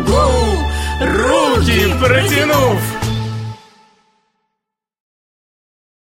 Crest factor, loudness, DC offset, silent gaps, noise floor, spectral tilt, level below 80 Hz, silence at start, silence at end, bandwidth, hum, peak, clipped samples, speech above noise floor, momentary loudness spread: 14 dB; -14 LUFS; under 0.1%; none; -79 dBFS; -5 dB/octave; -24 dBFS; 0 s; 2.55 s; 16.5 kHz; none; -2 dBFS; under 0.1%; 66 dB; 9 LU